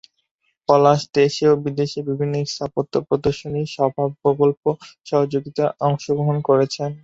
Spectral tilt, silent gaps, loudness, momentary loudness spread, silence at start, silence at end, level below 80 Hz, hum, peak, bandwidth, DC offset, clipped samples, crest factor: -6.5 dB/octave; 4.57-4.63 s; -20 LUFS; 8 LU; 0.7 s; 0.05 s; -54 dBFS; none; -2 dBFS; 7.8 kHz; under 0.1%; under 0.1%; 18 dB